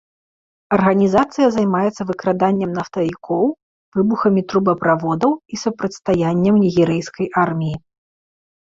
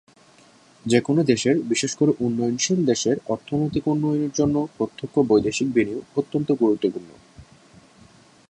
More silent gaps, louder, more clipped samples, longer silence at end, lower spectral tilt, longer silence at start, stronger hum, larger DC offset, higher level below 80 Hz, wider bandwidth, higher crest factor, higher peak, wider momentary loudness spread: first, 3.62-3.92 s vs none; first, -18 LUFS vs -22 LUFS; neither; about the same, 0.95 s vs 1.05 s; first, -7 dB/octave vs -5 dB/octave; second, 0.7 s vs 0.85 s; neither; neither; about the same, -52 dBFS vs -56 dBFS; second, 7.8 kHz vs 10.5 kHz; about the same, 18 dB vs 18 dB; first, 0 dBFS vs -4 dBFS; about the same, 8 LU vs 7 LU